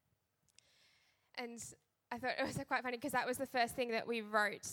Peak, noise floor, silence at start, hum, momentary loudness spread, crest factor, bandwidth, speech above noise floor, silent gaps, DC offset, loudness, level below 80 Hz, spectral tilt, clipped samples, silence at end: -20 dBFS; -81 dBFS; 1.35 s; none; 13 LU; 22 dB; 17.5 kHz; 41 dB; none; under 0.1%; -39 LUFS; -74 dBFS; -3 dB/octave; under 0.1%; 0 s